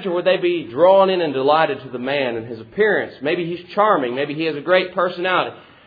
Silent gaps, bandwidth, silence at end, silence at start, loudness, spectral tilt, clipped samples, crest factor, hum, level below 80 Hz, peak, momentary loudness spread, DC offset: none; 5 kHz; 0.25 s; 0 s; -18 LUFS; -8 dB/octave; under 0.1%; 16 dB; none; -62 dBFS; -2 dBFS; 9 LU; under 0.1%